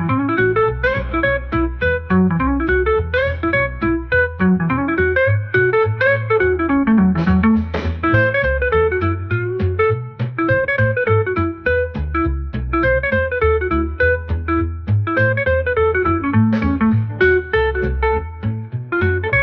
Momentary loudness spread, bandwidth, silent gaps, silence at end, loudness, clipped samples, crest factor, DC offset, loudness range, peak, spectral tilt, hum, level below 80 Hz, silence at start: 5 LU; 5.8 kHz; none; 0 s; -17 LUFS; under 0.1%; 14 dB; 0.2%; 3 LU; -2 dBFS; -9.5 dB/octave; none; -30 dBFS; 0 s